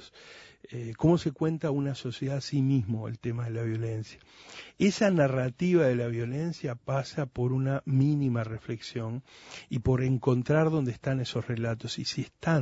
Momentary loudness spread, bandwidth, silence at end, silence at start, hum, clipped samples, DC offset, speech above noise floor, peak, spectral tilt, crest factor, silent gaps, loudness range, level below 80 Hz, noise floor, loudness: 15 LU; 8 kHz; 0 s; 0 s; none; under 0.1%; under 0.1%; 23 dB; -10 dBFS; -7 dB/octave; 18 dB; none; 3 LU; -56 dBFS; -52 dBFS; -29 LUFS